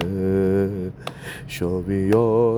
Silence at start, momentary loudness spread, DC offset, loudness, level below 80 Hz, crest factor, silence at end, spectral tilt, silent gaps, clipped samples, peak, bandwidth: 0 s; 15 LU; under 0.1%; -22 LUFS; -46 dBFS; 16 dB; 0 s; -7.5 dB/octave; none; under 0.1%; -6 dBFS; over 20 kHz